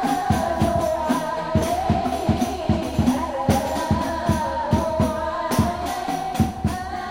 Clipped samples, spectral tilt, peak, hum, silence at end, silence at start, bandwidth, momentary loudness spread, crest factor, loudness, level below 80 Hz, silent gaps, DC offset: under 0.1%; -6 dB/octave; -4 dBFS; none; 0 s; 0 s; 16 kHz; 4 LU; 18 dB; -23 LUFS; -36 dBFS; none; under 0.1%